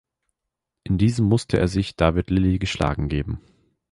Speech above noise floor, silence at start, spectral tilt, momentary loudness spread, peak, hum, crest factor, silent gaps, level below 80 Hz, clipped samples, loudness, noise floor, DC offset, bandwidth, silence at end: 63 dB; 0.85 s; -7 dB/octave; 9 LU; -4 dBFS; none; 18 dB; none; -34 dBFS; under 0.1%; -22 LUFS; -83 dBFS; under 0.1%; 11.5 kHz; 0.55 s